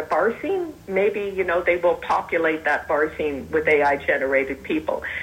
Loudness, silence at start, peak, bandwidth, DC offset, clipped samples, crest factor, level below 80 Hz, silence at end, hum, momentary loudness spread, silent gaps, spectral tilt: -22 LUFS; 0 s; -6 dBFS; 16 kHz; under 0.1%; under 0.1%; 16 dB; -50 dBFS; 0 s; none; 7 LU; none; -6 dB/octave